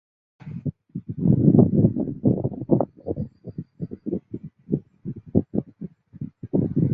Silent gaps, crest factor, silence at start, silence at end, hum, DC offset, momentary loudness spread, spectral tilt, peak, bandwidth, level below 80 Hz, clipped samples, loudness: none; 20 dB; 0.45 s; 0 s; none; under 0.1%; 21 LU; -15 dB/octave; -4 dBFS; 2.5 kHz; -46 dBFS; under 0.1%; -23 LUFS